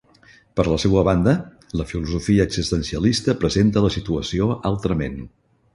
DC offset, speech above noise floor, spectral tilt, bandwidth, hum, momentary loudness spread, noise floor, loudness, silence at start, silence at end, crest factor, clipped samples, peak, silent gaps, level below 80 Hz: under 0.1%; 32 dB; -6 dB/octave; 11.5 kHz; none; 10 LU; -52 dBFS; -21 LUFS; 0.55 s; 0.45 s; 18 dB; under 0.1%; -2 dBFS; none; -36 dBFS